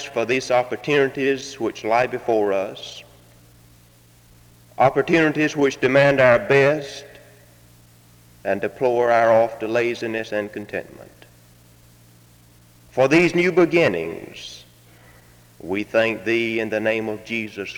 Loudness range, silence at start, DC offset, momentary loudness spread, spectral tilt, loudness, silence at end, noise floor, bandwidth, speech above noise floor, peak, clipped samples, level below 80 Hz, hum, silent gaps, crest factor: 7 LU; 0 s; under 0.1%; 16 LU; -5.5 dB/octave; -20 LUFS; 0 s; -52 dBFS; 20 kHz; 32 dB; -2 dBFS; under 0.1%; -56 dBFS; none; none; 20 dB